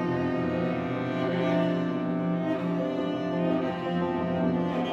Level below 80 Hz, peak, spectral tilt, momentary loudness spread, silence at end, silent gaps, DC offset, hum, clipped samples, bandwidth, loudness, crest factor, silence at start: -64 dBFS; -14 dBFS; -8.5 dB/octave; 3 LU; 0 s; none; under 0.1%; none; under 0.1%; 6.8 kHz; -28 LUFS; 12 dB; 0 s